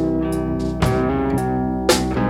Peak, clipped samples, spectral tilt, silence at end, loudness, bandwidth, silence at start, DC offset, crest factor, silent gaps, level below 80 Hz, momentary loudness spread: -2 dBFS; under 0.1%; -5.5 dB/octave; 0 s; -20 LUFS; 18 kHz; 0 s; under 0.1%; 16 dB; none; -32 dBFS; 4 LU